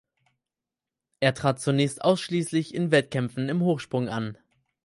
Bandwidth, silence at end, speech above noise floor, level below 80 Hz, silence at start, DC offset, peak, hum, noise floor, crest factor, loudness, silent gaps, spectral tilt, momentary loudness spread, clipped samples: 11.5 kHz; 0.5 s; 64 dB; -64 dBFS; 1.2 s; under 0.1%; -6 dBFS; none; -89 dBFS; 20 dB; -26 LUFS; none; -6 dB/octave; 6 LU; under 0.1%